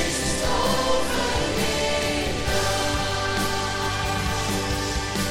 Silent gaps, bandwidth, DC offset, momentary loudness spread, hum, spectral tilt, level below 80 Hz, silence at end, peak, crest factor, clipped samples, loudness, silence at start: none; 16.5 kHz; under 0.1%; 3 LU; none; -3.5 dB/octave; -34 dBFS; 0 s; -10 dBFS; 14 dB; under 0.1%; -24 LUFS; 0 s